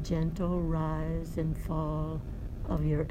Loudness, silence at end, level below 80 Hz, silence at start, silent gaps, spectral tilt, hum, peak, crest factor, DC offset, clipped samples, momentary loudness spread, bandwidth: -33 LUFS; 0 s; -38 dBFS; 0 s; none; -8.5 dB/octave; none; -16 dBFS; 14 dB; under 0.1%; under 0.1%; 7 LU; 14.5 kHz